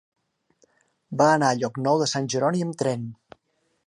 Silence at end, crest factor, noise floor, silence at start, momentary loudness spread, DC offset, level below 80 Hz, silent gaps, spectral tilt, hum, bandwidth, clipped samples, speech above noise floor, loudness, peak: 0.75 s; 20 dB; -71 dBFS; 1.1 s; 12 LU; under 0.1%; -70 dBFS; none; -5 dB/octave; none; 11.5 kHz; under 0.1%; 49 dB; -23 LUFS; -6 dBFS